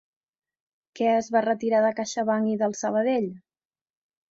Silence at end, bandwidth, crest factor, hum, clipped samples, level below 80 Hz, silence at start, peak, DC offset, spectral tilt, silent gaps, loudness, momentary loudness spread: 0.95 s; 7.8 kHz; 18 dB; none; under 0.1%; -72 dBFS; 0.95 s; -8 dBFS; under 0.1%; -5 dB/octave; none; -25 LUFS; 5 LU